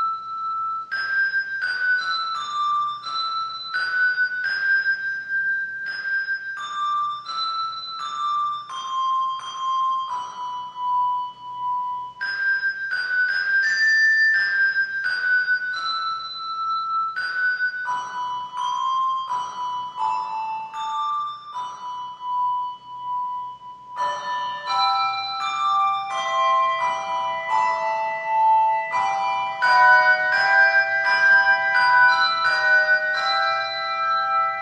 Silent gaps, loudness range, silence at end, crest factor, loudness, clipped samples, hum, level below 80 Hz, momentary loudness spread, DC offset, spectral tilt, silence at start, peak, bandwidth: none; 9 LU; 0 s; 18 dB; -21 LUFS; under 0.1%; none; -72 dBFS; 13 LU; under 0.1%; 0 dB/octave; 0 s; -4 dBFS; 9.4 kHz